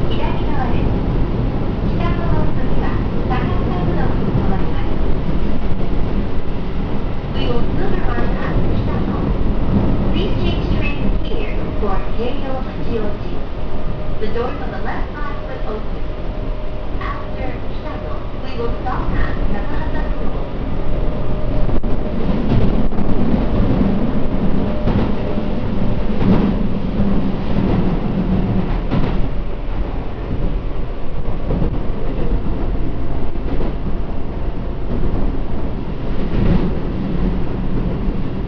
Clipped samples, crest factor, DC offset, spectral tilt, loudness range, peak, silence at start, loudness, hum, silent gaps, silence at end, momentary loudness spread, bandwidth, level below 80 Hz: under 0.1%; 14 dB; under 0.1%; -9.5 dB/octave; 6 LU; -2 dBFS; 0 s; -21 LUFS; none; none; 0 s; 8 LU; 5.4 kHz; -20 dBFS